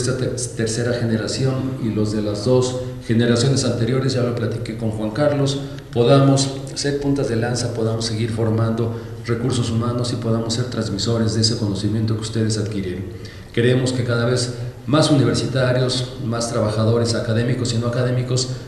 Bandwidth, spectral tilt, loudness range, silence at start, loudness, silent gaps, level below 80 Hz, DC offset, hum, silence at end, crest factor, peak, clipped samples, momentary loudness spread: 12.5 kHz; -5.5 dB/octave; 2 LU; 0 s; -20 LUFS; none; -44 dBFS; under 0.1%; none; 0 s; 16 dB; -4 dBFS; under 0.1%; 8 LU